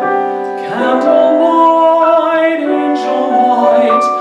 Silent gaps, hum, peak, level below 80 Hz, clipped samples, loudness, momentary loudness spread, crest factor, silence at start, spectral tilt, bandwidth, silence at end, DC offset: none; none; -2 dBFS; -62 dBFS; under 0.1%; -11 LUFS; 7 LU; 10 dB; 0 s; -5 dB/octave; 9.4 kHz; 0 s; under 0.1%